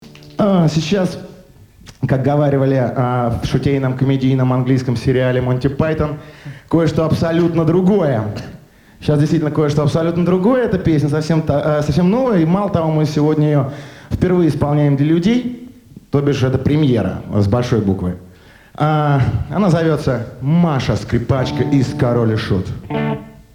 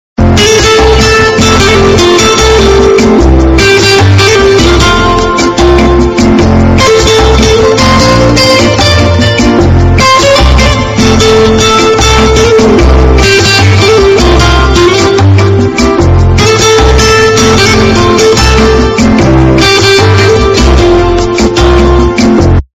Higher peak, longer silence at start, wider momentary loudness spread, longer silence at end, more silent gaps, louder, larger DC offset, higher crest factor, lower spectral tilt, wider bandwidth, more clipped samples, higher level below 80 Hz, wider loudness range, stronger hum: about the same, 0 dBFS vs 0 dBFS; second, 0 s vs 0.2 s; first, 7 LU vs 2 LU; about the same, 0.25 s vs 0.15 s; neither; second, -16 LUFS vs -4 LUFS; neither; first, 14 dB vs 4 dB; first, -8 dB/octave vs -4.5 dB/octave; second, 11.5 kHz vs 16 kHz; second, under 0.1% vs 10%; second, -40 dBFS vs -12 dBFS; about the same, 2 LU vs 1 LU; neither